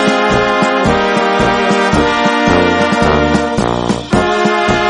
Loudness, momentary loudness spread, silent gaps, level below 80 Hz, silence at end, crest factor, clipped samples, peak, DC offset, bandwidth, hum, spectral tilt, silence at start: -12 LUFS; 3 LU; none; -30 dBFS; 0 s; 12 dB; under 0.1%; 0 dBFS; under 0.1%; 11 kHz; none; -5 dB/octave; 0 s